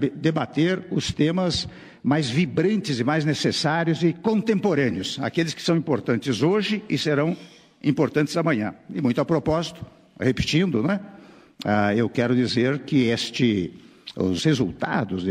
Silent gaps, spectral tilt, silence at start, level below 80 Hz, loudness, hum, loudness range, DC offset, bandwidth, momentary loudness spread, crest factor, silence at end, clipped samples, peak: none; -6 dB/octave; 0 s; -52 dBFS; -23 LUFS; none; 2 LU; under 0.1%; 13 kHz; 6 LU; 16 dB; 0 s; under 0.1%; -8 dBFS